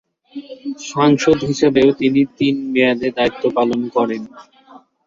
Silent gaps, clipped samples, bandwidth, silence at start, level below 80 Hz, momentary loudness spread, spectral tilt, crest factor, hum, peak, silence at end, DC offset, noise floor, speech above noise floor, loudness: none; under 0.1%; 7.6 kHz; 0.35 s; -52 dBFS; 16 LU; -5.5 dB/octave; 16 dB; none; -2 dBFS; 0.3 s; under 0.1%; -46 dBFS; 29 dB; -16 LUFS